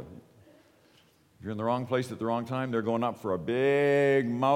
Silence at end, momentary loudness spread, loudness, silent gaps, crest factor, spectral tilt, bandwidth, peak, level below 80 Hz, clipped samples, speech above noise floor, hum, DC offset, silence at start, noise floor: 0 s; 10 LU; -28 LUFS; none; 16 dB; -7 dB/octave; 15 kHz; -12 dBFS; -68 dBFS; under 0.1%; 35 dB; none; under 0.1%; 0 s; -63 dBFS